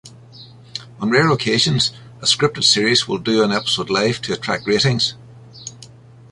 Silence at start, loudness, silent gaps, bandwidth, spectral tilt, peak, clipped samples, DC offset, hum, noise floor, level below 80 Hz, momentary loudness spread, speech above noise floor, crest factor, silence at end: 0.05 s; -17 LUFS; none; 11.5 kHz; -3.5 dB/octave; -2 dBFS; under 0.1%; under 0.1%; none; -42 dBFS; -52 dBFS; 18 LU; 25 dB; 18 dB; 0.45 s